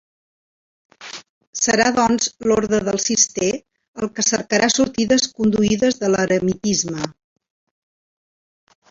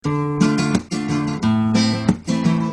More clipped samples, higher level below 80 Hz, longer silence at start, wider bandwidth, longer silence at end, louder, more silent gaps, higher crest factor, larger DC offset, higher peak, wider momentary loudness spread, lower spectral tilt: neither; about the same, -52 dBFS vs -48 dBFS; first, 1 s vs 0.05 s; second, 7.8 kHz vs 10.5 kHz; first, 1.8 s vs 0 s; about the same, -18 LUFS vs -19 LUFS; first, 1.29-1.41 s, 1.47-1.53 s, 3.88-3.94 s vs none; about the same, 18 dB vs 18 dB; neither; about the same, -2 dBFS vs -2 dBFS; first, 14 LU vs 5 LU; second, -3 dB/octave vs -6 dB/octave